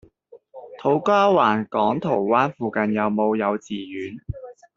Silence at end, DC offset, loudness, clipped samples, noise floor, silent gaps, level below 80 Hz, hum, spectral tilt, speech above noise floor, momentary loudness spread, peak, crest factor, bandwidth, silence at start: 0.25 s; under 0.1%; -21 LUFS; under 0.1%; -51 dBFS; none; -52 dBFS; none; -5 dB/octave; 30 dB; 16 LU; -4 dBFS; 18 dB; 7.6 kHz; 0.35 s